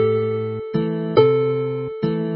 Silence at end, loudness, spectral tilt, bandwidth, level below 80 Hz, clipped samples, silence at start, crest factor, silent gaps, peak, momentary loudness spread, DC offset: 0 s; -20 LUFS; -12.5 dB/octave; 5.4 kHz; -56 dBFS; under 0.1%; 0 s; 18 dB; none; 0 dBFS; 9 LU; under 0.1%